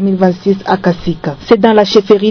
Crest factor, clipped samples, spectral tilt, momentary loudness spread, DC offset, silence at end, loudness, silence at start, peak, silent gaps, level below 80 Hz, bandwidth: 10 dB; 2%; -7 dB/octave; 9 LU; under 0.1%; 0 s; -11 LUFS; 0 s; 0 dBFS; none; -40 dBFS; 5.4 kHz